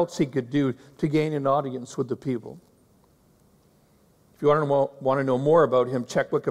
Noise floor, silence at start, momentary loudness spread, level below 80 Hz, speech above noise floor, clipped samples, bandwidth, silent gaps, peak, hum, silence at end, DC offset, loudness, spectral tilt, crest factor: -60 dBFS; 0 s; 11 LU; -64 dBFS; 36 dB; under 0.1%; 13 kHz; none; -8 dBFS; none; 0 s; under 0.1%; -24 LUFS; -7 dB/octave; 16 dB